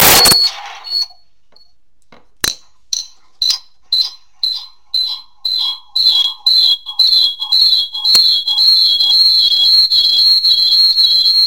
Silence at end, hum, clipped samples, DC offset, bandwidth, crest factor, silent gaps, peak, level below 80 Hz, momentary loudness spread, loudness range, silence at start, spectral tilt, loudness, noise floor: 0 s; none; under 0.1%; 0.9%; 17 kHz; 14 dB; none; 0 dBFS; -46 dBFS; 12 LU; 12 LU; 0 s; 0.5 dB/octave; -9 LUFS; -58 dBFS